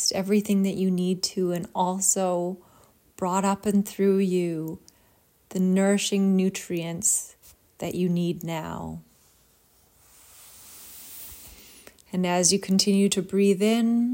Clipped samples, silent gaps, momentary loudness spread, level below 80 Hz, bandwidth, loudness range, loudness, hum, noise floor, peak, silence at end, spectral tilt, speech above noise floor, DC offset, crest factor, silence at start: under 0.1%; none; 19 LU; -64 dBFS; 16.5 kHz; 11 LU; -24 LUFS; none; -62 dBFS; -4 dBFS; 0 s; -4.5 dB/octave; 38 dB; under 0.1%; 20 dB; 0 s